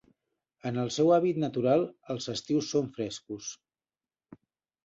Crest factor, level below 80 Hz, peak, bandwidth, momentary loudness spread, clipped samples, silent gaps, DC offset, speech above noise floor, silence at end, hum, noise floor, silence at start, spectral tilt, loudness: 18 dB; -70 dBFS; -12 dBFS; 8 kHz; 15 LU; under 0.1%; none; under 0.1%; over 61 dB; 1.3 s; none; under -90 dBFS; 0.65 s; -5.5 dB/octave; -29 LUFS